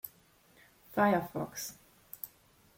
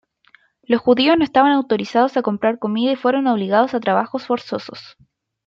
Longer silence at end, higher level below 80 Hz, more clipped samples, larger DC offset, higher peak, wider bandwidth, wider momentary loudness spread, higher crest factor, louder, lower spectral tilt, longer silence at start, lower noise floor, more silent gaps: about the same, 0.5 s vs 0.6 s; second, -70 dBFS vs -60 dBFS; neither; neither; second, -14 dBFS vs -2 dBFS; first, 17 kHz vs 7.4 kHz; first, 18 LU vs 9 LU; first, 22 dB vs 16 dB; second, -34 LUFS vs -18 LUFS; second, -5 dB/octave vs -6.5 dB/octave; second, 0.05 s vs 0.7 s; first, -64 dBFS vs -55 dBFS; neither